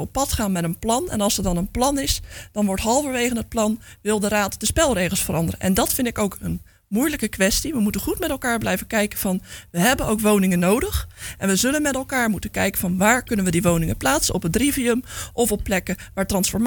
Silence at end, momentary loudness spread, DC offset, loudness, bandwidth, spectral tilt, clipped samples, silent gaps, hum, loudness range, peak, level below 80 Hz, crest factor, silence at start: 0 s; 7 LU; under 0.1%; -21 LUFS; 19.5 kHz; -4 dB/octave; under 0.1%; none; none; 2 LU; -4 dBFS; -36 dBFS; 18 dB; 0 s